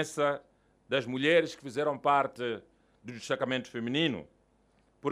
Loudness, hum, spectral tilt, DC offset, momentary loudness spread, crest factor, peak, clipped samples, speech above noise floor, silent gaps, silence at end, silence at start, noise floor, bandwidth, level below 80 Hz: -30 LUFS; none; -4.5 dB/octave; under 0.1%; 16 LU; 20 dB; -12 dBFS; under 0.1%; 38 dB; none; 0 s; 0 s; -68 dBFS; 14 kHz; -72 dBFS